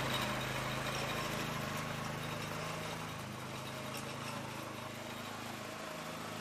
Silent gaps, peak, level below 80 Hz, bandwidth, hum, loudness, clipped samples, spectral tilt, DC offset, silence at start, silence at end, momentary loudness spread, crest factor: none; -24 dBFS; -60 dBFS; 15.5 kHz; none; -40 LUFS; under 0.1%; -4 dB/octave; under 0.1%; 0 s; 0 s; 7 LU; 18 dB